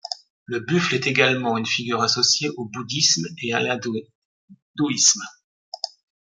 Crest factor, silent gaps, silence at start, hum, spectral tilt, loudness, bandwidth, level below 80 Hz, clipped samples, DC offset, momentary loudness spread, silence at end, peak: 22 dB; 0.30-0.46 s, 4.15-4.48 s, 4.62-4.74 s, 5.44-5.72 s; 0.05 s; none; -2.5 dB/octave; -20 LUFS; 11.5 kHz; -66 dBFS; under 0.1%; under 0.1%; 16 LU; 0.4 s; -2 dBFS